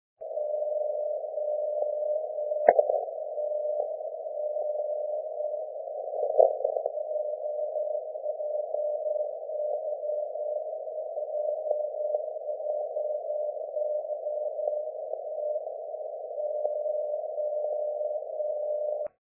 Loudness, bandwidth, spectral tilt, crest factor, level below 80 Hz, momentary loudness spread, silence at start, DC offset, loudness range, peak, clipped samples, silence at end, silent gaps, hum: -31 LUFS; 2.3 kHz; -5.5 dB/octave; 26 dB; -82 dBFS; 6 LU; 0.2 s; under 0.1%; 4 LU; -4 dBFS; under 0.1%; 0.15 s; none; none